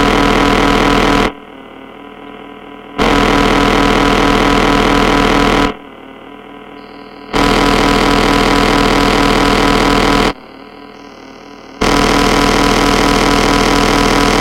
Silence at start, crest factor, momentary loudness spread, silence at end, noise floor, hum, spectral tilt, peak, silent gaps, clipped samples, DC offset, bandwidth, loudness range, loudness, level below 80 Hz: 0 s; 12 dB; 21 LU; 0 s; -33 dBFS; none; -4.5 dB/octave; 0 dBFS; none; under 0.1%; under 0.1%; 16.5 kHz; 3 LU; -11 LUFS; -24 dBFS